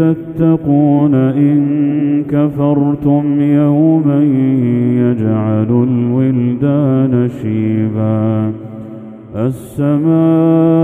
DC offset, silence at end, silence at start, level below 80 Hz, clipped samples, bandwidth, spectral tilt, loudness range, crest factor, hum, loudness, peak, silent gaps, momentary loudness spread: under 0.1%; 0 s; 0 s; -48 dBFS; under 0.1%; 3.6 kHz; -10.5 dB/octave; 3 LU; 12 dB; none; -13 LUFS; 0 dBFS; none; 8 LU